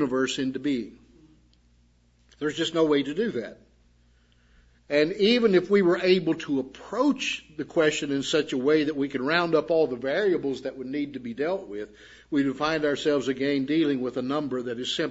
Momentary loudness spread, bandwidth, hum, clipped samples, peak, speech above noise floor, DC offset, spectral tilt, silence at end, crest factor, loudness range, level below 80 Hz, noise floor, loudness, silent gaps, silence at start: 11 LU; 8 kHz; none; under 0.1%; -6 dBFS; 36 dB; under 0.1%; -5 dB/octave; 0 s; 20 dB; 6 LU; -62 dBFS; -62 dBFS; -25 LUFS; none; 0 s